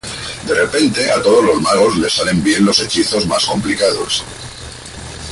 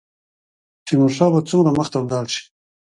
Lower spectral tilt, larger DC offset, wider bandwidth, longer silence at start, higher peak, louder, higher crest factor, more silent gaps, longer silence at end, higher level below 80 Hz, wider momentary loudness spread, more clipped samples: second, -3.5 dB/octave vs -6.5 dB/octave; neither; about the same, 11.5 kHz vs 11 kHz; second, 0.05 s vs 0.85 s; about the same, 0 dBFS vs -2 dBFS; first, -14 LUFS vs -18 LUFS; about the same, 14 dB vs 18 dB; neither; second, 0 s vs 0.55 s; first, -40 dBFS vs -56 dBFS; first, 18 LU vs 11 LU; neither